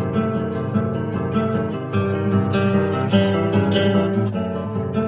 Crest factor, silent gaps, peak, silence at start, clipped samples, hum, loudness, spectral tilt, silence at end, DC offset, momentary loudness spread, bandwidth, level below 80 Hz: 16 dB; none; -4 dBFS; 0 s; under 0.1%; none; -20 LUFS; -11.5 dB/octave; 0 s; under 0.1%; 6 LU; 4 kHz; -42 dBFS